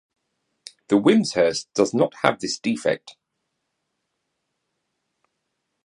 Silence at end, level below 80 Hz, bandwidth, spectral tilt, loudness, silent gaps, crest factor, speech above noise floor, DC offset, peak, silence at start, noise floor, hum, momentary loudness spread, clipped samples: 2.75 s; -64 dBFS; 11 kHz; -4.5 dB/octave; -21 LUFS; none; 24 dB; 57 dB; under 0.1%; 0 dBFS; 0.9 s; -78 dBFS; none; 8 LU; under 0.1%